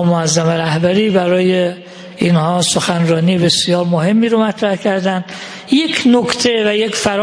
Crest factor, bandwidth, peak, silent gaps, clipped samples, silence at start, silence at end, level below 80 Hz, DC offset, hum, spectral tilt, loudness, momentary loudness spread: 14 dB; 10.5 kHz; 0 dBFS; none; under 0.1%; 0 s; 0 s; -52 dBFS; under 0.1%; none; -5 dB/octave; -14 LUFS; 6 LU